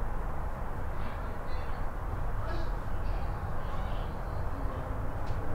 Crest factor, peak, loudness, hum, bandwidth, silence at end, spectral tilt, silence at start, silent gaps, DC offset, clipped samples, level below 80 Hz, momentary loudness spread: 12 dB; -20 dBFS; -38 LUFS; none; 5.8 kHz; 0 s; -7.5 dB/octave; 0 s; none; under 0.1%; under 0.1%; -36 dBFS; 2 LU